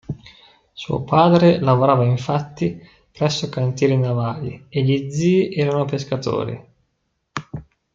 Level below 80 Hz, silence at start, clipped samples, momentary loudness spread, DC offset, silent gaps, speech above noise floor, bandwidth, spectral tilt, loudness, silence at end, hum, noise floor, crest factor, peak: -54 dBFS; 0.1 s; under 0.1%; 18 LU; under 0.1%; none; 53 dB; 7.6 kHz; -7 dB/octave; -19 LUFS; 0.35 s; none; -71 dBFS; 18 dB; 0 dBFS